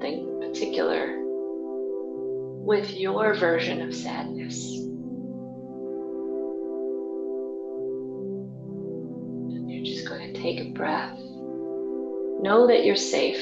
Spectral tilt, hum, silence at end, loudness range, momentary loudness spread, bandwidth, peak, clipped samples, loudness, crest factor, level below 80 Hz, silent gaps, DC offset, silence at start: -4.5 dB/octave; none; 0 s; 8 LU; 13 LU; 8.2 kHz; -8 dBFS; under 0.1%; -28 LUFS; 20 dB; -74 dBFS; none; under 0.1%; 0 s